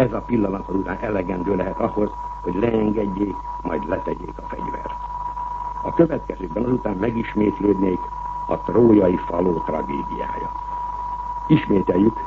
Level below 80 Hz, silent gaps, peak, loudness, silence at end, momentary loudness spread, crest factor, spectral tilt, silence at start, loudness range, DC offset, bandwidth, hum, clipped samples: -38 dBFS; none; -2 dBFS; -22 LUFS; 0 s; 11 LU; 18 dB; -9.5 dB/octave; 0 s; 5 LU; under 0.1%; 7 kHz; 50 Hz at -40 dBFS; under 0.1%